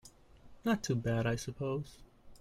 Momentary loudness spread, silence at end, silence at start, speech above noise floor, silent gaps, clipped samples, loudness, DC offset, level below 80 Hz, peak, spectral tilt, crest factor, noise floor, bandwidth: 7 LU; 0.05 s; 0.05 s; 23 dB; none; under 0.1%; -35 LUFS; under 0.1%; -58 dBFS; -18 dBFS; -6 dB/octave; 20 dB; -57 dBFS; 15.5 kHz